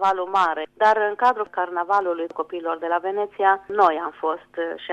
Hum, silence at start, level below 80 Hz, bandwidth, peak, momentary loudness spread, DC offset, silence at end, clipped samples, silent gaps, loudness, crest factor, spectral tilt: 50 Hz at -70 dBFS; 0 s; -68 dBFS; 8.6 kHz; -4 dBFS; 9 LU; under 0.1%; 0 s; under 0.1%; none; -22 LUFS; 18 dB; -4 dB/octave